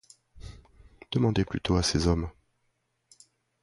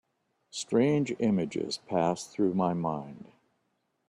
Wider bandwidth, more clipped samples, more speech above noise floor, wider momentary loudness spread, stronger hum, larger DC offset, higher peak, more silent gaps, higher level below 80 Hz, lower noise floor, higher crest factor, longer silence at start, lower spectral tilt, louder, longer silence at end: about the same, 11.5 kHz vs 12 kHz; neither; about the same, 50 dB vs 48 dB; first, 23 LU vs 13 LU; neither; neither; about the same, -10 dBFS vs -12 dBFS; neither; first, -42 dBFS vs -68 dBFS; about the same, -75 dBFS vs -77 dBFS; about the same, 20 dB vs 18 dB; second, 0.35 s vs 0.55 s; about the same, -5.5 dB/octave vs -6 dB/octave; about the same, -27 LUFS vs -29 LUFS; first, 1.3 s vs 0.85 s